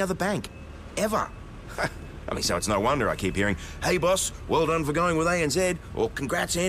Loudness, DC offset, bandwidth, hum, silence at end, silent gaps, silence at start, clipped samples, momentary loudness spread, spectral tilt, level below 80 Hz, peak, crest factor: -26 LUFS; under 0.1%; 15.5 kHz; none; 0 s; none; 0 s; under 0.1%; 11 LU; -4 dB/octave; -42 dBFS; -14 dBFS; 14 dB